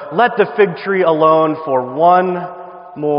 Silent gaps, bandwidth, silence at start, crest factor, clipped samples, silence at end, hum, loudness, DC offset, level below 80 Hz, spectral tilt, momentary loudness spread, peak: none; 5.4 kHz; 0 s; 14 dB; under 0.1%; 0 s; none; -14 LUFS; under 0.1%; -64 dBFS; -4.5 dB/octave; 14 LU; 0 dBFS